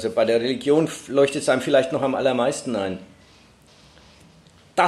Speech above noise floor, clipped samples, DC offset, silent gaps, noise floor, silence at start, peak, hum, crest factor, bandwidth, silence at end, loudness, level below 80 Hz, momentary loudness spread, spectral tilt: 31 dB; under 0.1%; under 0.1%; none; -52 dBFS; 0 s; -4 dBFS; none; 18 dB; 13 kHz; 0 s; -21 LUFS; -62 dBFS; 8 LU; -4.5 dB/octave